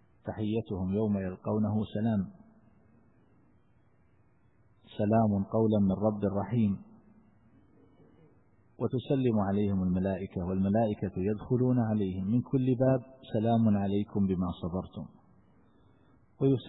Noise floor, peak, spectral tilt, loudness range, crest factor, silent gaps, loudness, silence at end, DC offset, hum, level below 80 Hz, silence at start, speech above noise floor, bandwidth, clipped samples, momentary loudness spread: -67 dBFS; -14 dBFS; -12.5 dB/octave; 6 LU; 16 dB; none; -30 LUFS; 0 s; under 0.1%; none; -60 dBFS; 0.25 s; 38 dB; 4 kHz; under 0.1%; 9 LU